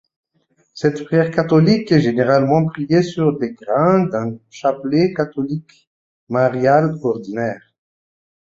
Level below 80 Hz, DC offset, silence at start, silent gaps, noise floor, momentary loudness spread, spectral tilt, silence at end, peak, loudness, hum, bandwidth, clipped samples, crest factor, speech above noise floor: -56 dBFS; under 0.1%; 0.75 s; 5.87-6.27 s; -63 dBFS; 10 LU; -8 dB/octave; 0.9 s; -2 dBFS; -17 LUFS; none; 7.6 kHz; under 0.1%; 16 dB; 46 dB